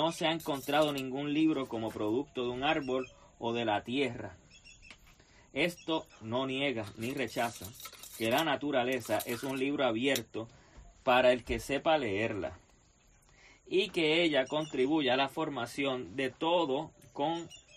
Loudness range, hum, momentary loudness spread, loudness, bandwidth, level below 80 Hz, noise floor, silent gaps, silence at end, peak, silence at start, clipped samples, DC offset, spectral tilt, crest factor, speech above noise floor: 5 LU; none; 11 LU; -32 LUFS; 15 kHz; -60 dBFS; -64 dBFS; none; 0.15 s; -14 dBFS; 0 s; under 0.1%; under 0.1%; -4.5 dB/octave; 20 dB; 32 dB